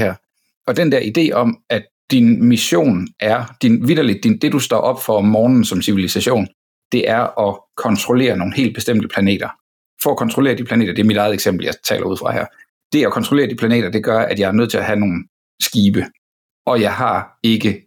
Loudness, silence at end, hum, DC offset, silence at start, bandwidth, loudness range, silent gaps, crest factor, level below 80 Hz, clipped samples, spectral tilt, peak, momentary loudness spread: -16 LUFS; 0.1 s; none; under 0.1%; 0 s; 19 kHz; 3 LU; 0.56-0.61 s, 1.91-2.08 s, 6.54-6.91 s, 9.61-9.97 s, 12.69-12.90 s, 15.29-15.58 s, 16.18-16.65 s; 12 dB; -56 dBFS; under 0.1%; -5.5 dB/octave; -4 dBFS; 8 LU